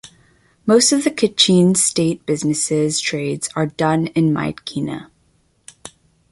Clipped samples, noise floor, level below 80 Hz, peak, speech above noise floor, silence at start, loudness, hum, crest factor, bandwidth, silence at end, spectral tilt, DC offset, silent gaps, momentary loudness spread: under 0.1%; -60 dBFS; -56 dBFS; 0 dBFS; 43 dB; 0.65 s; -17 LUFS; none; 18 dB; 11.5 kHz; 0.45 s; -4 dB/octave; under 0.1%; none; 13 LU